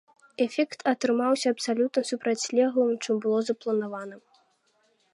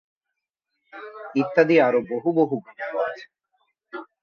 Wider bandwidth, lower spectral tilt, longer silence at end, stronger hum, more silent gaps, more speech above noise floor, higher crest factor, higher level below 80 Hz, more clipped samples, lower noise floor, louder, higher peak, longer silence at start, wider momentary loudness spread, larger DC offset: first, 11.5 kHz vs 6.6 kHz; second, -4 dB/octave vs -7.5 dB/octave; first, 0.95 s vs 0.2 s; neither; neither; second, 43 dB vs 62 dB; about the same, 16 dB vs 20 dB; second, -84 dBFS vs -72 dBFS; neither; second, -68 dBFS vs -84 dBFS; second, -26 LUFS vs -22 LUFS; second, -10 dBFS vs -4 dBFS; second, 0.4 s vs 0.95 s; second, 6 LU vs 22 LU; neither